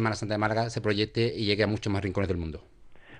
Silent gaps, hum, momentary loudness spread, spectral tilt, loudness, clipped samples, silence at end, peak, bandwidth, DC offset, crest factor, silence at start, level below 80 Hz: none; none; 6 LU; -6 dB/octave; -28 LUFS; under 0.1%; 0 s; -10 dBFS; 10 kHz; under 0.1%; 20 dB; 0 s; -50 dBFS